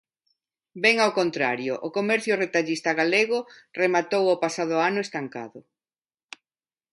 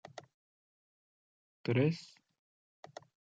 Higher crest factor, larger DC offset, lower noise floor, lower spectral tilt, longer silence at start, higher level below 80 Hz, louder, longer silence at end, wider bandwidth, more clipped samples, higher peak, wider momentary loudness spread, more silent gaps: about the same, 22 dB vs 22 dB; neither; about the same, under -90 dBFS vs under -90 dBFS; second, -4 dB/octave vs -7.5 dB/octave; first, 0.75 s vs 0.15 s; about the same, -76 dBFS vs -80 dBFS; first, -23 LUFS vs -34 LUFS; about the same, 1.35 s vs 1.3 s; first, 11.5 kHz vs 7.8 kHz; neither; first, -4 dBFS vs -18 dBFS; second, 11 LU vs 24 LU; second, none vs 0.34-1.64 s